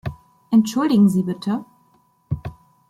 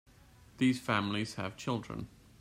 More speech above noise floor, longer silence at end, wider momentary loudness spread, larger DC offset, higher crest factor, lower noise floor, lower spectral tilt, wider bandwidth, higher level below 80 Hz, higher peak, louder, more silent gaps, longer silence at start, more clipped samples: first, 42 dB vs 26 dB; about the same, 0.4 s vs 0.35 s; about the same, 15 LU vs 13 LU; neither; about the same, 16 dB vs 20 dB; about the same, -59 dBFS vs -59 dBFS; first, -7 dB/octave vs -5.5 dB/octave; about the same, 15 kHz vs 15.5 kHz; first, -48 dBFS vs -62 dBFS; first, -6 dBFS vs -16 dBFS; first, -20 LUFS vs -34 LUFS; neither; second, 0.05 s vs 0.6 s; neither